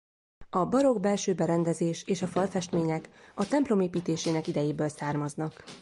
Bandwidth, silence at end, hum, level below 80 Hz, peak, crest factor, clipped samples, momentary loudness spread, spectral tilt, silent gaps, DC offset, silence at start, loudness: 11.5 kHz; 0 s; none; -62 dBFS; -14 dBFS; 16 dB; under 0.1%; 9 LU; -6 dB/octave; none; under 0.1%; 0.4 s; -29 LUFS